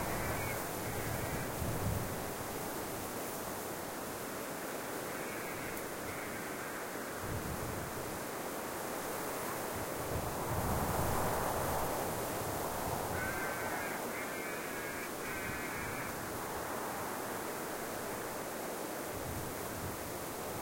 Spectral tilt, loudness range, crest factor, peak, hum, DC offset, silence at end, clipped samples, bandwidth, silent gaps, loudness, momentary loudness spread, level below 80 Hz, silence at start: -4 dB/octave; 4 LU; 18 dB; -20 dBFS; none; under 0.1%; 0 s; under 0.1%; 16.5 kHz; none; -38 LUFS; 5 LU; -54 dBFS; 0 s